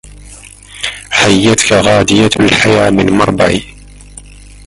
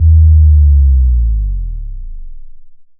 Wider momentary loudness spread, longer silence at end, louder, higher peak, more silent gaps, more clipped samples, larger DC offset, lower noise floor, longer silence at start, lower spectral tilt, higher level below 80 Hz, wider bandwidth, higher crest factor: second, 10 LU vs 21 LU; first, 0.45 s vs 0.15 s; about the same, -9 LUFS vs -10 LUFS; about the same, 0 dBFS vs 0 dBFS; neither; neither; neither; about the same, -34 dBFS vs -31 dBFS; first, 0.2 s vs 0 s; second, -4 dB/octave vs -26 dB/octave; second, -34 dBFS vs -10 dBFS; first, 11.5 kHz vs 0.3 kHz; about the same, 12 dB vs 8 dB